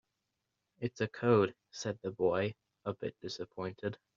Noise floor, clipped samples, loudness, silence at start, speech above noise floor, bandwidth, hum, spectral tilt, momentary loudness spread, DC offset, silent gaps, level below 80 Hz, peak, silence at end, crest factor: -86 dBFS; under 0.1%; -36 LUFS; 0.8 s; 51 dB; 7.4 kHz; none; -5.5 dB/octave; 13 LU; under 0.1%; none; -74 dBFS; -14 dBFS; 0.2 s; 22 dB